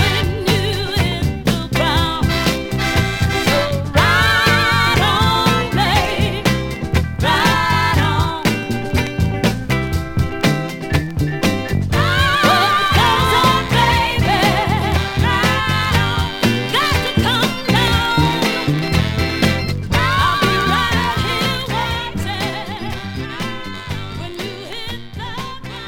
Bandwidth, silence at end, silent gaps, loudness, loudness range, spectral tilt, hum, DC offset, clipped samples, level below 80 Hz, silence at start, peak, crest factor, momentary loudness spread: 19 kHz; 0 s; none; -16 LUFS; 5 LU; -5 dB/octave; none; under 0.1%; under 0.1%; -30 dBFS; 0 s; 0 dBFS; 16 dB; 12 LU